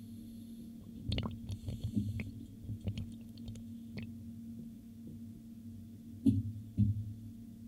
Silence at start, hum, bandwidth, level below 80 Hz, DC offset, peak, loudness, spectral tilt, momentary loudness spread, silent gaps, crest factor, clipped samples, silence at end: 0 s; none; 15.5 kHz; -56 dBFS; under 0.1%; -16 dBFS; -41 LUFS; -7.5 dB/octave; 16 LU; none; 24 dB; under 0.1%; 0 s